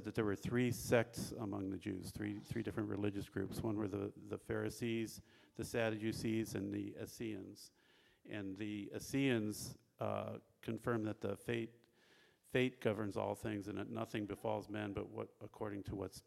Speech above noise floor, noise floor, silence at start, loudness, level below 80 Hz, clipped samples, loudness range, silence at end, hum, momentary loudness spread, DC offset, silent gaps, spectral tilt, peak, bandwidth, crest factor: 29 dB; -70 dBFS; 0 s; -42 LUFS; -68 dBFS; under 0.1%; 2 LU; 0.05 s; none; 11 LU; under 0.1%; none; -6 dB/octave; -20 dBFS; 16 kHz; 22 dB